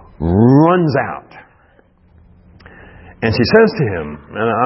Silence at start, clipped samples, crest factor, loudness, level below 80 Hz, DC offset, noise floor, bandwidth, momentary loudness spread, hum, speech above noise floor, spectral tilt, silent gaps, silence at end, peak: 0.2 s; under 0.1%; 16 dB; -14 LUFS; -40 dBFS; under 0.1%; -51 dBFS; 5.8 kHz; 15 LU; none; 36 dB; -10.5 dB/octave; none; 0 s; 0 dBFS